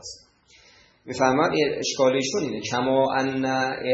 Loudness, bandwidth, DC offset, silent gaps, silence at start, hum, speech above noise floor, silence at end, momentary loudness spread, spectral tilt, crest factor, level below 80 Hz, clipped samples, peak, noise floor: -23 LUFS; 8.2 kHz; under 0.1%; none; 0.05 s; none; 33 dB; 0 s; 6 LU; -4 dB/octave; 18 dB; -62 dBFS; under 0.1%; -6 dBFS; -56 dBFS